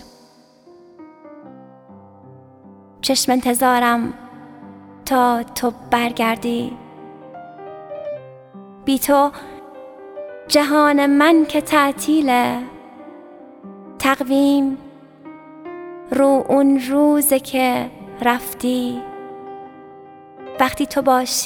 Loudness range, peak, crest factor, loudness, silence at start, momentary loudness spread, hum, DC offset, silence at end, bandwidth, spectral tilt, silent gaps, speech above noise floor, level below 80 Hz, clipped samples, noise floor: 7 LU; 0 dBFS; 18 dB; -17 LUFS; 1 s; 24 LU; none; under 0.1%; 0 s; 19 kHz; -3 dB/octave; none; 33 dB; -54 dBFS; under 0.1%; -50 dBFS